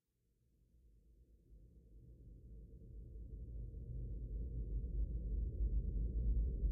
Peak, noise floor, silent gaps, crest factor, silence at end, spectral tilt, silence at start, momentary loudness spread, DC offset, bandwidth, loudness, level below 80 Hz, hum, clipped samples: -28 dBFS; -80 dBFS; none; 16 dB; 0 s; -18.5 dB/octave; 0.85 s; 21 LU; under 0.1%; 0.7 kHz; -45 LUFS; -44 dBFS; none; under 0.1%